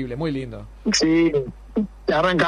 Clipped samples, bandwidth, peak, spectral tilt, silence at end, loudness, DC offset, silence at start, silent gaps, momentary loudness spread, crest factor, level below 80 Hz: under 0.1%; 10.5 kHz; -4 dBFS; -4.5 dB/octave; 0 s; -22 LUFS; under 0.1%; 0 s; none; 11 LU; 16 dB; -42 dBFS